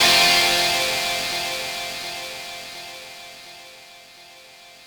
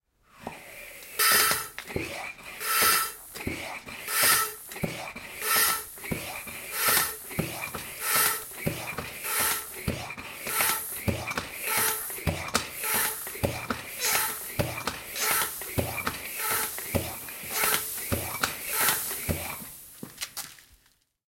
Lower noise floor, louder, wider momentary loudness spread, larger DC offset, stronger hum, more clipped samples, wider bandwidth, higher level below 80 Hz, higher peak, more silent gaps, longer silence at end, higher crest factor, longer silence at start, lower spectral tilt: second, -46 dBFS vs -66 dBFS; first, -19 LUFS vs -27 LUFS; first, 24 LU vs 14 LU; neither; neither; neither; first, over 20 kHz vs 16.5 kHz; about the same, -56 dBFS vs -54 dBFS; about the same, -4 dBFS vs -6 dBFS; neither; second, 0.1 s vs 0.55 s; second, 18 dB vs 24 dB; second, 0 s vs 0.35 s; second, 0 dB/octave vs -1.5 dB/octave